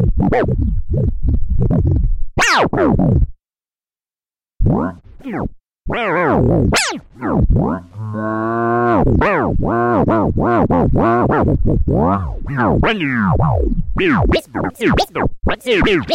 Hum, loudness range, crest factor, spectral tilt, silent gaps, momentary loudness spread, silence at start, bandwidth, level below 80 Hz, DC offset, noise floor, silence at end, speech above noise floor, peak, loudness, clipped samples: none; 4 LU; 12 dB; -6.5 dB/octave; none; 9 LU; 0 s; 15.5 kHz; -22 dBFS; under 0.1%; under -90 dBFS; 0 s; over 75 dB; -4 dBFS; -16 LUFS; under 0.1%